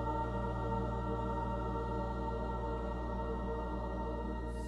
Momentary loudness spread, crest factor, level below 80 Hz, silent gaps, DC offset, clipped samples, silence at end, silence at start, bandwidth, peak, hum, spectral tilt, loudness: 3 LU; 12 dB; -42 dBFS; none; under 0.1%; under 0.1%; 0 s; 0 s; 8.6 kHz; -24 dBFS; none; -8.5 dB/octave; -38 LUFS